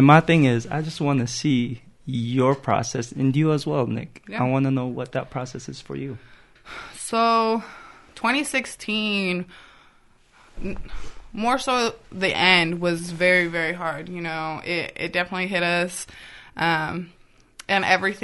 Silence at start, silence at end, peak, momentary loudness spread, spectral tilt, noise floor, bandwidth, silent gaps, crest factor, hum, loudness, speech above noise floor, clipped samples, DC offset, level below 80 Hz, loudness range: 0 s; 0 s; -2 dBFS; 18 LU; -5 dB/octave; -56 dBFS; 11.5 kHz; none; 22 dB; none; -22 LUFS; 33 dB; under 0.1%; under 0.1%; -48 dBFS; 6 LU